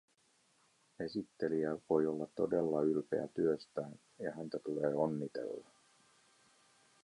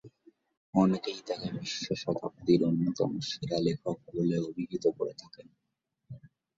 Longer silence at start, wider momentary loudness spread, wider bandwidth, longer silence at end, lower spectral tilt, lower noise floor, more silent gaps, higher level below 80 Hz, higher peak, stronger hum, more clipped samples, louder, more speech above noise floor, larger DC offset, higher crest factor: first, 1 s vs 0.05 s; about the same, 11 LU vs 11 LU; first, 11 kHz vs 7.8 kHz; first, 1.45 s vs 0.4 s; about the same, -7.5 dB/octave vs -6.5 dB/octave; second, -73 dBFS vs -83 dBFS; second, none vs 0.57-0.73 s; second, -76 dBFS vs -66 dBFS; second, -20 dBFS vs -10 dBFS; neither; neither; second, -37 LUFS vs -31 LUFS; second, 37 dB vs 53 dB; neither; about the same, 20 dB vs 20 dB